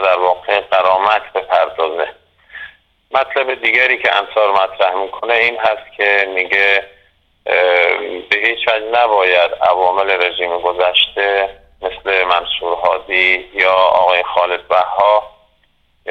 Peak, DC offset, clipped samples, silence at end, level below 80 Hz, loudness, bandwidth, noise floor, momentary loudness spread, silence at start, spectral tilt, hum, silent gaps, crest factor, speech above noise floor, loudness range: 0 dBFS; under 0.1%; under 0.1%; 0 s; -52 dBFS; -14 LUFS; 7.8 kHz; -57 dBFS; 7 LU; 0 s; -3 dB/octave; none; none; 14 dB; 43 dB; 3 LU